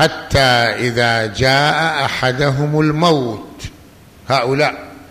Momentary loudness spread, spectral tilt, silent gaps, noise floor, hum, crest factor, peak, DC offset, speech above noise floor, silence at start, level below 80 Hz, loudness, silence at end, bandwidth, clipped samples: 15 LU; -5 dB/octave; none; -42 dBFS; none; 14 dB; -2 dBFS; under 0.1%; 27 dB; 0 s; -38 dBFS; -15 LUFS; 0.05 s; 15 kHz; under 0.1%